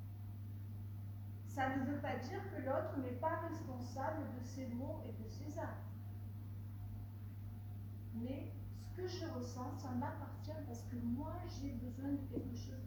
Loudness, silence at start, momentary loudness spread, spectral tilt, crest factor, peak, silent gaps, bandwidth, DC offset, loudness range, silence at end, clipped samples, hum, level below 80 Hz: -45 LUFS; 0 s; 9 LU; -7 dB/octave; 18 dB; -26 dBFS; none; over 20 kHz; under 0.1%; 6 LU; 0 s; under 0.1%; none; -60 dBFS